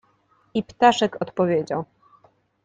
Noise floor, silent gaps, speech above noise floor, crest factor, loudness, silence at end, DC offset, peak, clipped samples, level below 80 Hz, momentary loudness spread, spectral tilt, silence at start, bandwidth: -63 dBFS; none; 41 dB; 20 dB; -22 LUFS; 0.8 s; under 0.1%; -4 dBFS; under 0.1%; -62 dBFS; 12 LU; -5 dB/octave; 0.55 s; 9.4 kHz